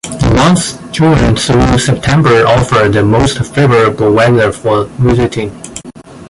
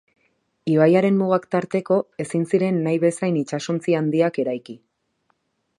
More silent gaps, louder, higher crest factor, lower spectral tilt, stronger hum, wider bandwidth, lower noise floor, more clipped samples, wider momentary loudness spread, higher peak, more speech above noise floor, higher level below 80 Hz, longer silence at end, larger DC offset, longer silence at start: neither; first, -9 LUFS vs -21 LUFS; second, 10 dB vs 18 dB; second, -5.5 dB/octave vs -7 dB/octave; neither; about the same, 11.5 kHz vs 11 kHz; second, -31 dBFS vs -69 dBFS; neither; about the same, 8 LU vs 10 LU; first, 0 dBFS vs -4 dBFS; second, 22 dB vs 49 dB; first, -26 dBFS vs -70 dBFS; second, 0 s vs 1.05 s; neither; second, 0.05 s vs 0.65 s